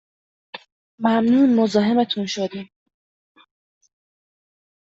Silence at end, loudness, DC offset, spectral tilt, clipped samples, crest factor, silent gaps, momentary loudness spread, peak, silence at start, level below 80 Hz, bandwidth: 2.25 s; -19 LUFS; under 0.1%; -5.5 dB/octave; under 0.1%; 18 dB; 0.72-0.98 s; 24 LU; -4 dBFS; 0.55 s; -66 dBFS; 7.8 kHz